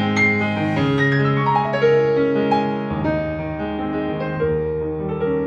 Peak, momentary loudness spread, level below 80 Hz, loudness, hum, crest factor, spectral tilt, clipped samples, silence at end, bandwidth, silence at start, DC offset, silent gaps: -6 dBFS; 8 LU; -44 dBFS; -20 LUFS; none; 14 dB; -7.5 dB/octave; under 0.1%; 0 s; 7.4 kHz; 0 s; under 0.1%; none